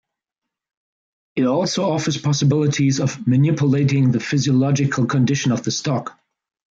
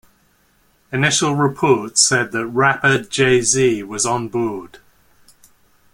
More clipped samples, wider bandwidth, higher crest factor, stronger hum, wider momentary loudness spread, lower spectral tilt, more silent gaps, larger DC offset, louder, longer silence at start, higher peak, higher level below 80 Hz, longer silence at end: neither; second, 7.8 kHz vs 16.5 kHz; second, 12 dB vs 18 dB; neither; second, 5 LU vs 9 LU; first, -6 dB/octave vs -3.5 dB/octave; neither; neither; second, -19 LUFS vs -16 LUFS; first, 1.35 s vs 0.9 s; second, -8 dBFS vs 0 dBFS; second, -60 dBFS vs -54 dBFS; second, 0.7 s vs 1.25 s